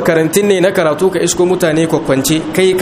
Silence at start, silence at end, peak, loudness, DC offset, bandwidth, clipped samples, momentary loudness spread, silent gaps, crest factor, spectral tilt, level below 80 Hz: 0 s; 0 s; 0 dBFS; -12 LUFS; under 0.1%; 16 kHz; under 0.1%; 2 LU; none; 12 dB; -4.5 dB/octave; -42 dBFS